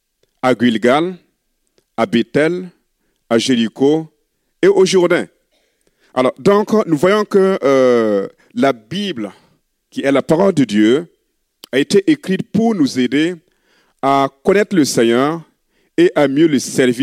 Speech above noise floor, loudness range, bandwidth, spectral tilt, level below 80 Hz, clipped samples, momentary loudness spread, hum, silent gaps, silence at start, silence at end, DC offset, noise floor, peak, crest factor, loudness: 52 dB; 3 LU; 15 kHz; -5.5 dB/octave; -58 dBFS; under 0.1%; 11 LU; none; none; 0.45 s; 0 s; under 0.1%; -66 dBFS; -2 dBFS; 14 dB; -15 LUFS